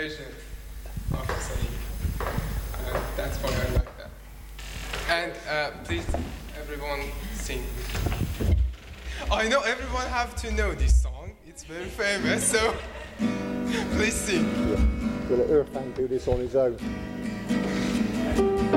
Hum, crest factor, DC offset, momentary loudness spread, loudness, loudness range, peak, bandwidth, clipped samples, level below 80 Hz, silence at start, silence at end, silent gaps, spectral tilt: none; 18 dB; under 0.1%; 15 LU; -28 LUFS; 6 LU; -8 dBFS; 17 kHz; under 0.1%; -32 dBFS; 0 s; 0 s; none; -5 dB/octave